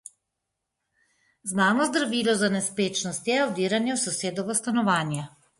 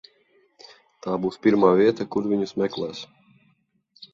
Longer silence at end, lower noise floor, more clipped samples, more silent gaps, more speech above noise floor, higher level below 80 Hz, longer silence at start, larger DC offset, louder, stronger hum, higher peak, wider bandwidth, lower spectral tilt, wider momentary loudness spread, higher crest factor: first, 0.3 s vs 0.1 s; first, -83 dBFS vs -67 dBFS; neither; neither; first, 58 dB vs 45 dB; second, -70 dBFS vs -64 dBFS; first, 1.45 s vs 1.05 s; neither; second, -25 LUFS vs -22 LUFS; neither; second, -8 dBFS vs -4 dBFS; first, 11.5 kHz vs 7.8 kHz; second, -3.5 dB/octave vs -7 dB/octave; second, 6 LU vs 18 LU; about the same, 18 dB vs 22 dB